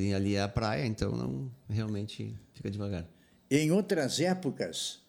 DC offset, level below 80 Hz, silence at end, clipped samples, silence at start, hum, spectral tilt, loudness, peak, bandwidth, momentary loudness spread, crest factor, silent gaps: under 0.1%; -54 dBFS; 0.1 s; under 0.1%; 0 s; none; -5.5 dB/octave; -32 LUFS; -14 dBFS; 19 kHz; 12 LU; 18 dB; none